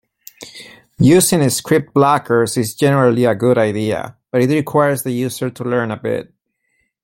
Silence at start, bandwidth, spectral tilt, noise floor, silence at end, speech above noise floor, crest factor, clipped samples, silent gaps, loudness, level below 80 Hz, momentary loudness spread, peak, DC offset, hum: 0.4 s; 16.5 kHz; -5.5 dB/octave; -67 dBFS; 0.8 s; 52 dB; 16 dB; under 0.1%; none; -16 LUFS; -50 dBFS; 12 LU; 0 dBFS; under 0.1%; none